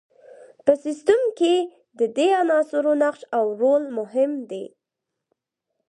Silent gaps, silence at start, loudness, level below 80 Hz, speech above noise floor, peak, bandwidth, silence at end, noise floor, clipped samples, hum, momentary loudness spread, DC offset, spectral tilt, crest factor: none; 0.4 s; -21 LUFS; -74 dBFS; 62 dB; -4 dBFS; 10 kHz; 1.2 s; -83 dBFS; under 0.1%; none; 10 LU; under 0.1%; -4 dB/octave; 18 dB